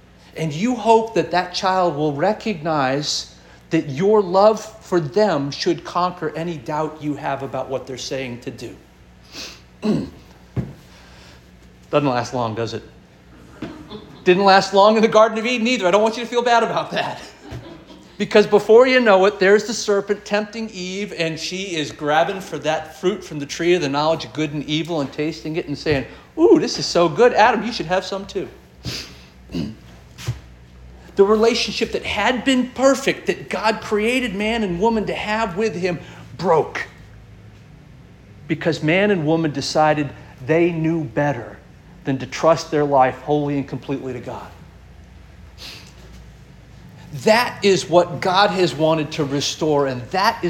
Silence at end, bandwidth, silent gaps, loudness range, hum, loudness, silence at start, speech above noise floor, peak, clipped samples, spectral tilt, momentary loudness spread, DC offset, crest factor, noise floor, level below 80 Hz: 0 s; 17 kHz; none; 11 LU; 60 Hz at -55 dBFS; -19 LUFS; 0.35 s; 28 dB; -2 dBFS; under 0.1%; -5 dB/octave; 18 LU; under 0.1%; 18 dB; -46 dBFS; -48 dBFS